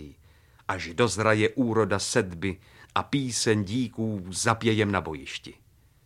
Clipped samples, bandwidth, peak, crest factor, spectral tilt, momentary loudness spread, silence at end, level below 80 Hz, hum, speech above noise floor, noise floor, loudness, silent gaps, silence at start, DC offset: under 0.1%; 14.5 kHz; -4 dBFS; 22 dB; -4.5 dB/octave; 12 LU; 0.55 s; -56 dBFS; none; 30 dB; -57 dBFS; -26 LUFS; none; 0 s; under 0.1%